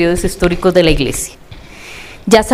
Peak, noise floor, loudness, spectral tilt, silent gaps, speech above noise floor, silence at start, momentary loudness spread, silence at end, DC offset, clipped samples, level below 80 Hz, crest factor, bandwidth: 0 dBFS; -34 dBFS; -13 LUFS; -4.5 dB/octave; none; 23 dB; 0 s; 20 LU; 0 s; 0.4%; 0.2%; -26 dBFS; 14 dB; 16.5 kHz